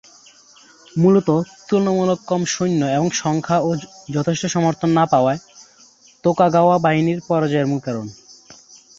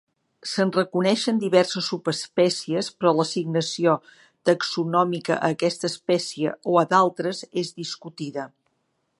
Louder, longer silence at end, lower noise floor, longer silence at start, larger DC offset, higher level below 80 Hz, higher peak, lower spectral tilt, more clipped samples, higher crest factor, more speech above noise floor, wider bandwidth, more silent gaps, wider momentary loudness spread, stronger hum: first, -18 LUFS vs -23 LUFS; second, 0.45 s vs 0.7 s; second, -50 dBFS vs -73 dBFS; first, 0.95 s vs 0.45 s; neither; first, -58 dBFS vs -74 dBFS; about the same, -2 dBFS vs -2 dBFS; about the same, -6 dB/octave vs -5 dB/octave; neither; about the same, 16 dB vs 20 dB; second, 33 dB vs 50 dB; second, 7.8 kHz vs 11.5 kHz; neither; second, 9 LU vs 12 LU; neither